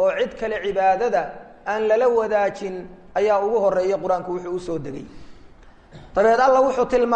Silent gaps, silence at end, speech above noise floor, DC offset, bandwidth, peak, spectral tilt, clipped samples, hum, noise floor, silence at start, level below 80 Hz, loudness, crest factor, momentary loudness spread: none; 0 s; 26 dB; under 0.1%; 9 kHz; -4 dBFS; -5.5 dB/octave; under 0.1%; none; -46 dBFS; 0 s; -50 dBFS; -21 LUFS; 16 dB; 15 LU